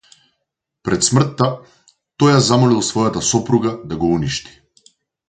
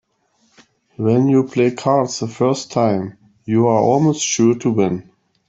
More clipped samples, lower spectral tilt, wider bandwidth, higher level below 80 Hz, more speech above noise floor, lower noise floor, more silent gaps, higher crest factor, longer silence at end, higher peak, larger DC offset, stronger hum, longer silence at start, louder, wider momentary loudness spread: neither; about the same, -5 dB/octave vs -6 dB/octave; first, 9.6 kHz vs 8 kHz; first, -46 dBFS vs -58 dBFS; first, 60 dB vs 46 dB; first, -76 dBFS vs -62 dBFS; neither; about the same, 18 dB vs 14 dB; first, 0.85 s vs 0.45 s; about the same, 0 dBFS vs -2 dBFS; neither; neither; second, 0.85 s vs 1 s; about the same, -16 LUFS vs -17 LUFS; about the same, 10 LU vs 8 LU